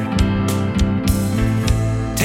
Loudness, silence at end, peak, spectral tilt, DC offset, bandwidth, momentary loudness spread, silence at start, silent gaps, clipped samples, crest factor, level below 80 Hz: -19 LUFS; 0 s; -2 dBFS; -6 dB/octave; under 0.1%; 17 kHz; 1 LU; 0 s; none; under 0.1%; 14 dB; -26 dBFS